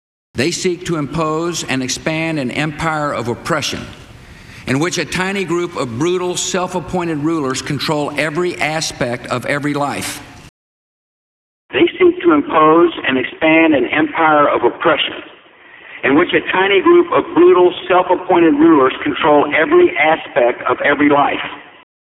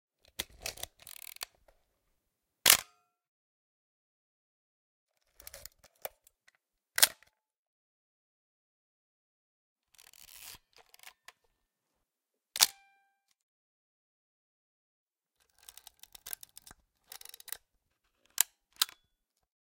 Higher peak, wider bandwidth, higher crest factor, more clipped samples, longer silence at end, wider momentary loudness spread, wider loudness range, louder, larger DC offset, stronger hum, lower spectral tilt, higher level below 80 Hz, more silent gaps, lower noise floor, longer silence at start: about the same, -2 dBFS vs 0 dBFS; second, 13.5 kHz vs 17 kHz; second, 14 dB vs 40 dB; neither; second, 0.55 s vs 0.8 s; second, 10 LU vs 27 LU; second, 8 LU vs 23 LU; first, -14 LUFS vs -29 LUFS; neither; neither; first, -4.5 dB/octave vs 2 dB/octave; first, -48 dBFS vs -72 dBFS; second, 10.49-11.69 s vs 3.28-5.07 s, 7.57-9.76 s, 13.43-15.07 s; second, -42 dBFS vs -88 dBFS; about the same, 0.35 s vs 0.4 s